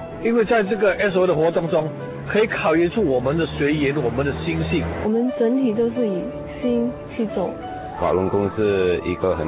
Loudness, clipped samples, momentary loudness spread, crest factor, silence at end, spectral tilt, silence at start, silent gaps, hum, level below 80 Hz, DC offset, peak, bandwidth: -21 LUFS; under 0.1%; 8 LU; 12 dB; 0 s; -11 dB/octave; 0 s; none; none; -40 dBFS; under 0.1%; -8 dBFS; 4 kHz